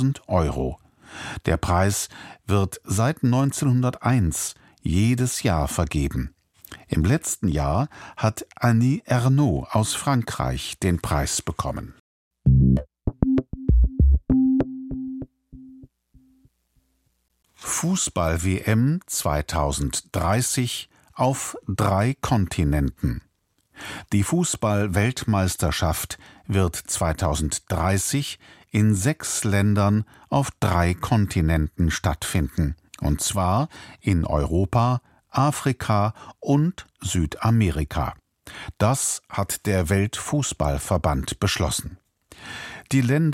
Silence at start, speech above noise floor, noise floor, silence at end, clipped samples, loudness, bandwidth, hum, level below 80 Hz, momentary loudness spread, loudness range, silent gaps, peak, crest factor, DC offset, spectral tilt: 0 s; 47 dB; -70 dBFS; 0 s; under 0.1%; -23 LUFS; 16.5 kHz; none; -32 dBFS; 11 LU; 3 LU; 12.00-12.31 s; -2 dBFS; 20 dB; under 0.1%; -5.5 dB/octave